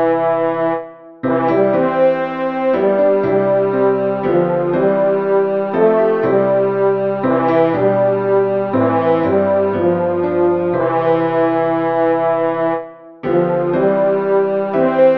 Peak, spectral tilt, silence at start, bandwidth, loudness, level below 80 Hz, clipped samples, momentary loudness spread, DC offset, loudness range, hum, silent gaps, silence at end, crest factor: -2 dBFS; -10 dB/octave; 0 s; 5 kHz; -15 LUFS; -58 dBFS; under 0.1%; 4 LU; 0.3%; 2 LU; none; none; 0 s; 14 dB